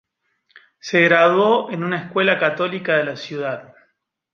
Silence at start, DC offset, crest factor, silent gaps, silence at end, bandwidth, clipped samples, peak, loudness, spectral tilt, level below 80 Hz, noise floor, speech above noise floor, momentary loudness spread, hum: 0.85 s; under 0.1%; 18 dB; none; 0.7 s; 7.2 kHz; under 0.1%; -2 dBFS; -18 LUFS; -5.5 dB/octave; -70 dBFS; -67 dBFS; 49 dB; 13 LU; none